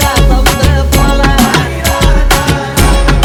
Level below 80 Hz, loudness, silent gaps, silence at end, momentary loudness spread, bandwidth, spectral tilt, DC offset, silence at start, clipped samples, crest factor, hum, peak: -10 dBFS; -9 LUFS; none; 0 s; 2 LU; 18 kHz; -4.5 dB/octave; under 0.1%; 0 s; 2%; 8 dB; none; 0 dBFS